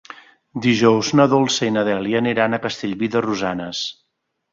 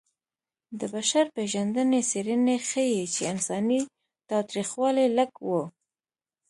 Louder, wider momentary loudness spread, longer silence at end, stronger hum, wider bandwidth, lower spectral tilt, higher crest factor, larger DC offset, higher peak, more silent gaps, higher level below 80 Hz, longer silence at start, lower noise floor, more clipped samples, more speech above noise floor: first, -19 LUFS vs -26 LUFS; first, 10 LU vs 7 LU; second, 0.6 s vs 0.8 s; neither; second, 7.6 kHz vs 11.5 kHz; about the same, -5 dB/octave vs -4 dB/octave; about the same, 18 dB vs 16 dB; neither; first, -2 dBFS vs -10 dBFS; neither; first, -58 dBFS vs -76 dBFS; second, 0.1 s vs 0.7 s; second, -43 dBFS vs under -90 dBFS; neither; second, 24 dB vs over 64 dB